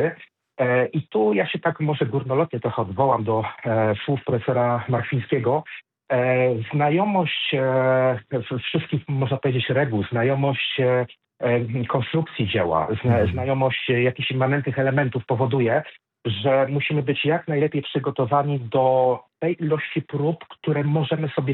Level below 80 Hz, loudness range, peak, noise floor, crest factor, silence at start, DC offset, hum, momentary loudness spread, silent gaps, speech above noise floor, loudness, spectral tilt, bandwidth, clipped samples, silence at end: -56 dBFS; 1 LU; -6 dBFS; -42 dBFS; 16 dB; 0 s; under 0.1%; none; 6 LU; none; 20 dB; -22 LUFS; -10.5 dB/octave; 4.2 kHz; under 0.1%; 0 s